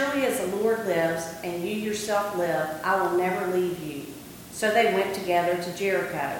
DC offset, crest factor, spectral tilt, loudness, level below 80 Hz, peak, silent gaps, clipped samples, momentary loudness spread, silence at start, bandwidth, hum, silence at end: under 0.1%; 18 dB; -4.5 dB/octave; -26 LUFS; -60 dBFS; -8 dBFS; none; under 0.1%; 9 LU; 0 s; 17.5 kHz; none; 0 s